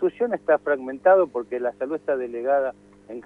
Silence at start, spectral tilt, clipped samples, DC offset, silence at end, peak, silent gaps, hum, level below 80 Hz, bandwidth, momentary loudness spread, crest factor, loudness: 0 s; -7.5 dB/octave; under 0.1%; under 0.1%; 0.05 s; -6 dBFS; none; 50 Hz at -55 dBFS; -68 dBFS; 3.7 kHz; 10 LU; 18 dB; -23 LUFS